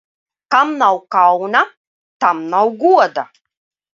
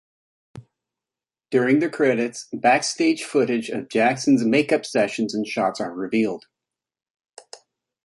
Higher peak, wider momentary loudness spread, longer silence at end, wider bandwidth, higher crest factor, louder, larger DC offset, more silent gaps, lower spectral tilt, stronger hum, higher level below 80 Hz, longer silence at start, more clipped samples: first, 0 dBFS vs -4 dBFS; about the same, 7 LU vs 7 LU; first, 0.7 s vs 0.5 s; second, 7.4 kHz vs 11.5 kHz; about the same, 16 dB vs 18 dB; first, -14 LUFS vs -21 LUFS; neither; first, 1.77-2.20 s vs 7.10-7.14 s; about the same, -4.5 dB/octave vs -4.5 dB/octave; neither; about the same, -70 dBFS vs -68 dBFS; about the same, 0.5 s vs 0.55 s; neither